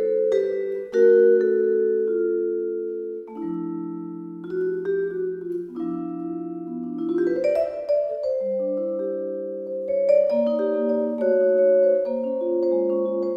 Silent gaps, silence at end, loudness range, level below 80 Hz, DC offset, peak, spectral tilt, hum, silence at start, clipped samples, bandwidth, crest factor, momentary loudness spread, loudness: none; 0 s; 8 LU; -68 dBFS; under 0.1%; -8 dBFS; -8.5 dB/octave; none; 0 s; under 0.1%; 6.8 kHz; 14 dB; 13 LU; -23 LUFS